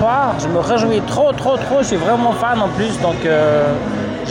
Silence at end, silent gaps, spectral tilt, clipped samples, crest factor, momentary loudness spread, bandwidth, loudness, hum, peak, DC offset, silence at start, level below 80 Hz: 0 s; none; -5.5 dB/octave; under 0.1%; 10 dB; 4 LU; 16.5 kHz; -16 LUFS; none; -6 dBFS; under 0.1%; 0 s; -40 dBFS